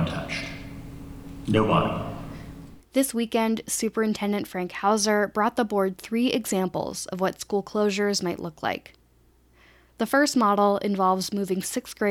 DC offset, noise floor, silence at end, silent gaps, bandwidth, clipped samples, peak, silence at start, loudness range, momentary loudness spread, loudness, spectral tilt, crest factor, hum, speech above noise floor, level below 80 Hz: under 0.1%; -60 dBFS; 0 s; none; 17.5 kHz; under 0.1%; -8 dBFS; 0 s; 3 LU; 16 LU; -25 LUFS; -4.5 dB/octave; 18 dB; none; 35 dB; -52 dBFS